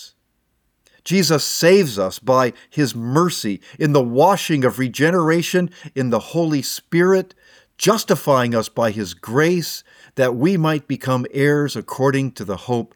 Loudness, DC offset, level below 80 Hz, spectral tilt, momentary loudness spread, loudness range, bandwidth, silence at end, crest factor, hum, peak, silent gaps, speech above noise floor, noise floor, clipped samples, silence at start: -18 LUFS; under 0.1%; -62 dBFS; -5 dB/octave; 9 LU; 2 LU; 19 kHz; 0.1 s; 16 dB; none; -4 dBFS; none; 50 dB; -68 dBFS; under 0.1%; 0 s